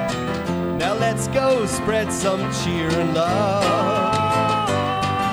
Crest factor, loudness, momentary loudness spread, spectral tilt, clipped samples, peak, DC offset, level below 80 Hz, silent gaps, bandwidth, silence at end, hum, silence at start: 14 dB; -20 LUFS; 4 LU; -5 dB/octave; under 0.1%; -6 dBFS; under 0.1%; -44 dBFS; none; over 20 kHz; 0 s; none; 0 s